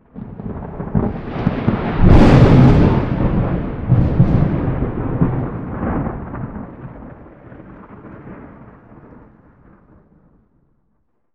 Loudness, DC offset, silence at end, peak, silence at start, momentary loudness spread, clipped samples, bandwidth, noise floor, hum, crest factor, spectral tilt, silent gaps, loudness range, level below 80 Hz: -16 LUFS; under 0.1%; 2.7 s; 0 dBFS; 0.15 s; 27 LU; under 0.1%; 7 kHz; -67 dBFS; none; 16 dB; -9.5 dB/octave; none; 18 LU; -24 dBFS